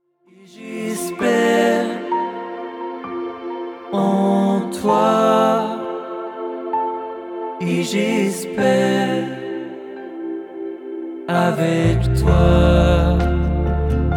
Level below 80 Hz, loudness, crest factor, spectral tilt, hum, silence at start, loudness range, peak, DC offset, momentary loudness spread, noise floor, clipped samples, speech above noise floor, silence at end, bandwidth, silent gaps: -26 dBFS; -19 LUFS; 18 dB; -6.5 dB/octave; none; 0.55 s; 5 LU; -2 dBFS; under 0.1%; 15 LU; -49 dBFS; under 0.1%; 34 dB; 0 s; 16.5 kHz; none